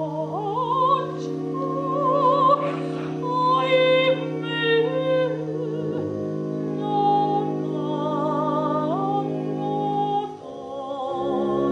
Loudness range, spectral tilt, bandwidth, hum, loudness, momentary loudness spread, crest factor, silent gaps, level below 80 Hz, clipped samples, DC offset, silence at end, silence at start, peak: 4 LU; -7 dB/octave; 9.6 kHz; none; -23 LUFS; 9 LU; 16 dB; none; -64 dBFS; under 0.1%; under 0.1%; 0 s; 0 s; -8 dBFS